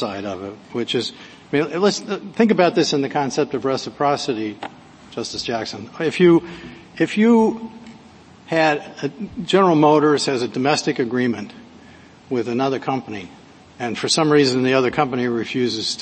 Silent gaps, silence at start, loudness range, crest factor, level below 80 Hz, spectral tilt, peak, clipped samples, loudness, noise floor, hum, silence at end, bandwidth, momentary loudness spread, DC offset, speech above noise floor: none; 0 s; 5 LU; 18 dB; -58 dBFS; -5 dB/octave; -2 dBFS; under 0.1%; -19 LUFS; -45 dBFS; none; 0 s; 8.8 kHz; 15 LU; under 0.1%; 26 dB